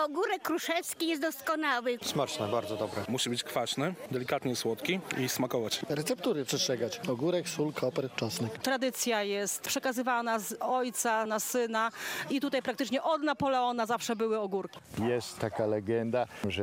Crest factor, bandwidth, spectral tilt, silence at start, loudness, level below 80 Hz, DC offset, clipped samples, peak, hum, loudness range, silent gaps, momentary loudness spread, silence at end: 22 dB; 16.5 kHz; -3.5 dB/octave; 0 s; -32 LUFS; -72 dBFS; under 0.1%; under 0.1%; -10 dBFS; none; 2 LU; none; 4 LU; 0 s